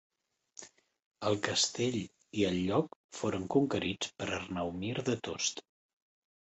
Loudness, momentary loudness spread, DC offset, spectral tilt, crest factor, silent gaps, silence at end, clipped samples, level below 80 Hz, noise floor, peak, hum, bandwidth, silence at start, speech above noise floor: -33 LUFS; 12 LU; under 0.1%; -4 dB/octave; 22 dB; 1.06-1.11 s, 2.96-3.09 s; 0.9 s; under 0.1%; -62 dBFS; -57 dBFS; -14 dBFS; none; 8.4 kHz; 0.6 s; 24 dB